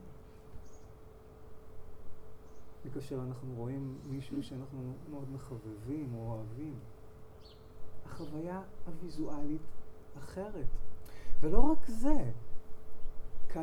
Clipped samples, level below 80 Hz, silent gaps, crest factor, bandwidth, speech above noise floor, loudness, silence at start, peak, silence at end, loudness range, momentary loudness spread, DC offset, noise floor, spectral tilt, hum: under 0.1%; -40 dBFS; none; 20 dB; 4.9 kHz; 25 dB; -41 LUFS; 0.05 s; -8 dBFS; 0 s; 7 LU; 21 LU; under 0.1%; -53 dBFS; -8 dB/octave; none